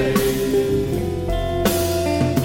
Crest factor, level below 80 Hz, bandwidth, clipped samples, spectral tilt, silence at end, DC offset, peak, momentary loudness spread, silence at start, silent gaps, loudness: 14 dB; -32 dBFS; 17 kHz; under 0.1%; -5.5 dB/octave; 0 s; under 0.1%; -6 dBFS; 4 LU; 0 s; none; -20 LUFS